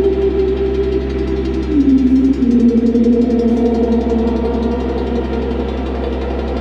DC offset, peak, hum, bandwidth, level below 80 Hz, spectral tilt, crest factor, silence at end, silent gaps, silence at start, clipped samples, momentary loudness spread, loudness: under 0.1%; -2 dBFS; none; 7.4 kHz; -24 dBFS; -9 dB/octave; 12 dB; 0 s; none; 0 s; under 0.1%; 8 LU; -15 LUFS